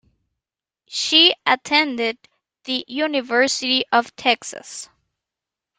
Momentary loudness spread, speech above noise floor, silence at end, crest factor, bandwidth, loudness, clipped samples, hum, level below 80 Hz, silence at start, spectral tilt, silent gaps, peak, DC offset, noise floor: 21 LU; 67 dB; 0.95 s; 22 dB; 13.5 kHz; -18 LUFS; under 0.1%; none; -70 dBFS; 0.9 s; -0.5 dB/octave; none; 0 dBFS; under 0.1%; -87 dBFS